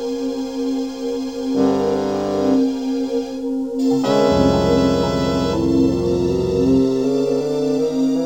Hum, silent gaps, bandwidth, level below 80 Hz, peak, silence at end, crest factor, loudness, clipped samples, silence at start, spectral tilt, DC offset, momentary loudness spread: none; none; 16 kHz; -40 dBFS; 0 dBFS; 0 s; 18 dB; -19 LUFS; under 0.1%; 0 s; -6.5 dB/octave; 0.4%; 8 LU